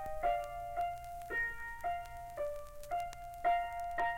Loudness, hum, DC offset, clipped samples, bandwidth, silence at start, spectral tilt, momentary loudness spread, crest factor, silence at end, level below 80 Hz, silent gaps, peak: -39 LUFS; none; under 0.1%; under 0.1%; 17 kHz; 0 s; -4 dB/octave; 9 LU; 16 dB; 0 s; -54 dBFS; none; -24 dBFS